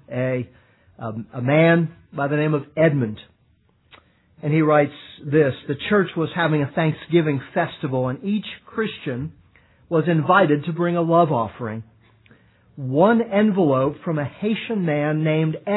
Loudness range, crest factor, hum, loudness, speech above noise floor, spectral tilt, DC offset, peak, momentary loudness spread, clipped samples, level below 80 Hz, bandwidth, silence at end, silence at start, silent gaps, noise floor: 2 LU; 20 dB; none; -21 LUFS; 41 dB; -11 dB/octave; under 0.1%; -2 dBFS; 14 LU; under 0.1%; -62 dBFS; 4.1 kHz; 0 s; 0.1 s; none; -61 dBFS